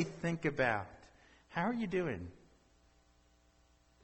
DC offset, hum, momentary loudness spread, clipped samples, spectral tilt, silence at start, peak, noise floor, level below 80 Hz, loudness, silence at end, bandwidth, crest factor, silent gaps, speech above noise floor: under 0.1%; 60 Hz at -60 dBFS; 13 LU; under 0.1%; -6.5 dB/octave; 0 s; -20 dBFS; -69 dBFS; -64 dBFS; -37 LUFS; 1.7 s; 8.4 kHz; 20 dB; none; 33 dB